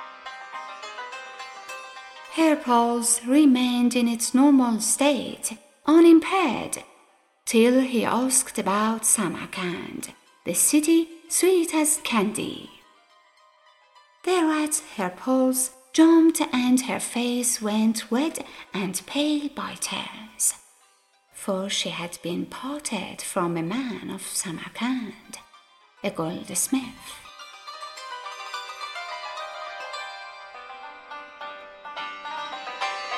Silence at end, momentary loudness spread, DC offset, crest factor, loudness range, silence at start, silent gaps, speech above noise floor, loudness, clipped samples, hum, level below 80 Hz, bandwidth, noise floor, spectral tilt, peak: 0 s; 20 LU; under 0.1%; 20 dB; 14 LU; 0 s; none; 39 dB; -23 LUFS; under 0.1%; none; -66 dBFS; 15 kHz; -62 dBFS; -3 dB/octave; -4 dBFS